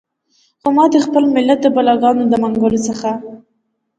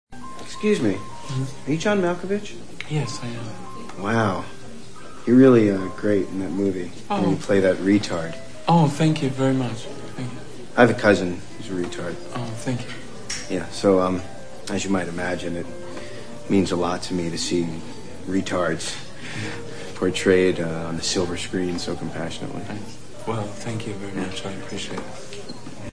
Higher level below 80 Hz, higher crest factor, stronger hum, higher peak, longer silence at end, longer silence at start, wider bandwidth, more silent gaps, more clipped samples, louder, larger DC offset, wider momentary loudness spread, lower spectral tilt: about the same, -54 dBFS vs -52 dBFS; second, 14 dB vs 22 dB; neither; about the same, 0 dBFS vs -2 dBFS; first, 0.6 s vs 0 s; first, 0.65 s vs 0.05 s; second, 9.2 kHz vs 11 kHz; neither; neither; first, -14 LUFS vs -23 LUFS; second, under 0.1% vs 2%; second, 10 LU vs 17 LU; about the same, -5.5 dB/octave vs -5.5 dB/octave